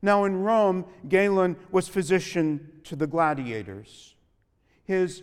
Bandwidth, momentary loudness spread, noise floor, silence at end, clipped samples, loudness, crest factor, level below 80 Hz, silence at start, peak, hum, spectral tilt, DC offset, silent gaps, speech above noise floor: 14 kHz; 13 LU; -67 dBFS; 0 s; under 0.1%; -25 LUFS; 18 dB; -62 dBFS; 0 s; -8 dBFS; none; -6 dB/octave; under 0.1%; none; 42 dB